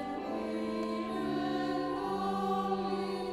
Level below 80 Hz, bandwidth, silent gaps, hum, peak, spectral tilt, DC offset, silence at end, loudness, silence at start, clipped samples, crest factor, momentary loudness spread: -62 dBFS; 14.5 kHz; none; none; -20 dBFS; -6.5 dB/octave; under 0.1%; 0 s; -34 LUFS; 0 s; under 0.1%; 14 dB; 3 LU